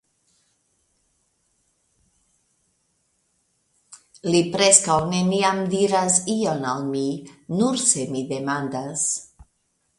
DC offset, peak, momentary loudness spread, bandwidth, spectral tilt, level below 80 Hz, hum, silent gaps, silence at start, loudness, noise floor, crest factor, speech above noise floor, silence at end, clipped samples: under 0.1%; 0 dBFS; 13 LU; 11.5 kHz; -3.5 dB/octave; -60 dBFS; none; none; 3.9 s; -21 LUFS; -70 dBFS; 24 dB; 49 dB; 0.75 s; under 0.1%